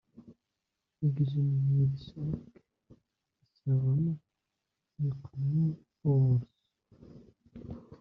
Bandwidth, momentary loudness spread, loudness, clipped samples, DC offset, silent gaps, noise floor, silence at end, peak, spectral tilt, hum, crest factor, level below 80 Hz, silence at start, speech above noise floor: 4.9 kHz; 16 LU; -31 LUFS; under 0.1%; under 0.1%; none; -86 dBFS; 0.05 s; -18 dBFS; -12 dB/octave; none; 14 dB; -62 dBFS; 0.25 s; 57 dB